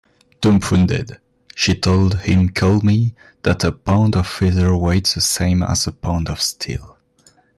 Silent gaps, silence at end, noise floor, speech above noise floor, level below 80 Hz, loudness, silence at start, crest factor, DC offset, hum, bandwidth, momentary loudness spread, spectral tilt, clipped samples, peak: none; 0.7 s; -54 dBFS; 38 dB; -40 dBFS; -17 LUFS; 0.4 s; 12 dB; under 0.1%; none; 13 kHz; 8 LU; -5 dB/octave; under 0.1%; -6 dBFS